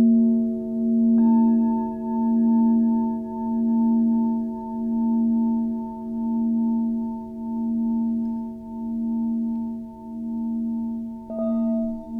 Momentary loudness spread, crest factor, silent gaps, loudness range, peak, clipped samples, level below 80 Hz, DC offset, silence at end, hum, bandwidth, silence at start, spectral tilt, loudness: 12 LU; 12 dB; none; 7 LU; -10 dBFS; under 0.1%; -52 dBFS; under 0.1%; 0 s; none; 1.8 kHz; 0 s; -11.5 dB/octave; -23 LUFS